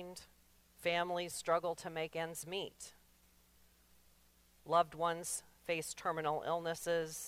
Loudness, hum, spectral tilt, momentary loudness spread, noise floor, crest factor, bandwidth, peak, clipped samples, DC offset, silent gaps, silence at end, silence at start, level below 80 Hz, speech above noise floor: -38 LUFS; none; -3 dB/octave; 13 LU; -69 dBFS; 22 dB; 16 kHz; -18 dBFS; under 0.1%; under 0.1%; none; 0 s; 0 s; -72 dBFS; 30 dB